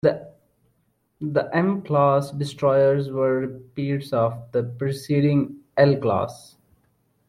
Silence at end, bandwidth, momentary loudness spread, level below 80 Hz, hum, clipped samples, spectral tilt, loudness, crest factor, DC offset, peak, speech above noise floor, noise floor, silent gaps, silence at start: 0.9 s; 13 kHz; 10 LU; -60 dBFS; none; under 0.1%; -8 dB/octave; -22 LUFS; 18 dB; under 0.1%; -4 dBFS; 47 dB; -68 dBFS; none; 0.05 s